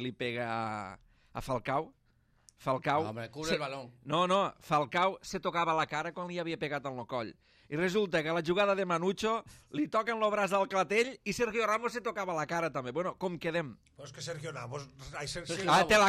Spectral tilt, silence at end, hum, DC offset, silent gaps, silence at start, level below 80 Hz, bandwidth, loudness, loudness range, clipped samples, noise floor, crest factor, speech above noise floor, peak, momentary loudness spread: -4.5 dB/octave; 0 s; none; under 0.1%; none; 0 s; -62 dBFS; 15 kHz; -33 LUFS; 5 LU; under 0.1%; -66 dBFS; 16 dB; 33 dB; -16 dBFS; 13 LU